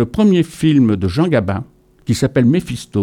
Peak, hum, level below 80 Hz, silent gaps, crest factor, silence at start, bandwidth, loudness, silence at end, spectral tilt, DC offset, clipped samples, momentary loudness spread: -2 dBFS; none; -42 dBFS; none; 14 dB; 0 s; 15.5 kHz; -15 LUFS; 0 s; -7 dB/octave; under 0.1%; under 0.1%; 9 LU